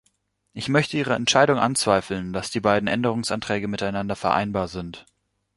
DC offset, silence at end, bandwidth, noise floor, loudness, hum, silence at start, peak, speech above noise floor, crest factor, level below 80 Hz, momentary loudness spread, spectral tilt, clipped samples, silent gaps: under 0.1%; 0.55 s; 11.5 kHz; -69 dBFS; -23 LUFS; none; 0.55 s; -2 dBFS; 46 dB; 20 dB; -52 dBFS; 11 LU; -4.5 dB/octave; under 0.1%; none